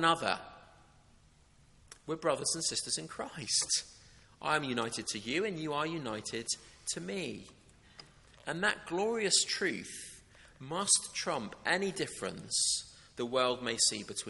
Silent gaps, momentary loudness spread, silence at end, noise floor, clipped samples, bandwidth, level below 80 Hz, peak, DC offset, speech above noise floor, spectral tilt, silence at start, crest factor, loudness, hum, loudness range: none; 14 LU; 0 s; -63 dBFS; under 0.1%; 11.5 kHz; -66 dBFS; -12 dBFS; under 0.1%; 29 dB; -2 dB/octave; 0 s; 22 dB; -33 LUFS; none; 5 LU